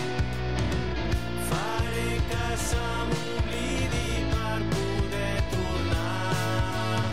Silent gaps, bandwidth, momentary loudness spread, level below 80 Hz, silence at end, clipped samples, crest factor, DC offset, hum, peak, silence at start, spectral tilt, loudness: none; 16 kHz; 2 LU; -34 dBFS; 0 s; under 0.1%; 12 dB; 2%; none; -16 dBFS; 0 s; -5 dB/octave; -28 LUFS